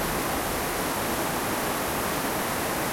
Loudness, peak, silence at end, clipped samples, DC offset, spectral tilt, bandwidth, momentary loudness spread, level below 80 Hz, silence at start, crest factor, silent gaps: -27 LUFS; -14 dBFS; 0 s; under 0.1%; under 0.1%; -3 dB/octave; 16.5 kHz; 0 LU; -44 dBFS; 0 s; 14 dB; none